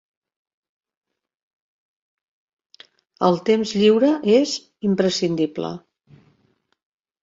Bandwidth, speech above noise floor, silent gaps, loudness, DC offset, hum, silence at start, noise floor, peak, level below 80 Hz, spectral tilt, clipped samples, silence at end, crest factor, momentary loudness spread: 8 kHz; 47 dB; none; -19 LUFS; under 0.1%; none; 3.2 s; -65 dBFS; -4 dBFS; -64 dBFS; -5.5 dB/octave; under 0.1%; 1.45 s; 18 dB; 10 LU